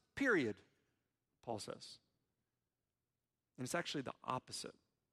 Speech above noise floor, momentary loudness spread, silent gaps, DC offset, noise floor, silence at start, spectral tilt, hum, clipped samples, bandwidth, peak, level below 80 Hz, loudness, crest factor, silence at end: over 48 dB; 19 LU; none; under 0.1%; under -90 dBFS; 0.15 s; -4 dB/octave; none; under 0.1%; 15 kHz; -22 dBFS; -78 dBFS; -42 LUFS; 22 dB; 0.4 s